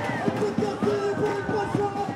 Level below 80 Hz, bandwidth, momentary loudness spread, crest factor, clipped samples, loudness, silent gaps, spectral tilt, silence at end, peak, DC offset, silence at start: -58 dBFS; 12.5 kHz; 1 LU; 16 dB; under 0.1%; -26 LUFS; none; -6.5 dB/octave; 0 s; -10 dBFS; under 0.1%; 0 s